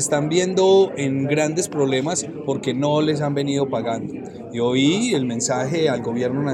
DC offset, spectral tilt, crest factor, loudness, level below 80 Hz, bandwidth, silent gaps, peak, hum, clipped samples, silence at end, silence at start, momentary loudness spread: under 0.1%; -5 dB/octave; 14 dB; -20 LUFS; -60 dBFS; 13.5 kHz; none; -6 dBFS; none; under 0.1%; 0 s; 0 s; 8 LU